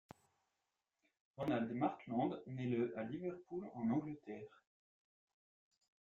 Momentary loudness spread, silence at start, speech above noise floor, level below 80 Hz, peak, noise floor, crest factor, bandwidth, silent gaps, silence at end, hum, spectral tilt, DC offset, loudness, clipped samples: 11 LU; 1.4 s; 48 dB; -80 dBFS; -26 dBFS; -90 dBFS; 20 dB; 7.2 kHz; none; 1.7 s; none; -7 dB/octave; under 0.1%; -42 LUFS; under 0.1%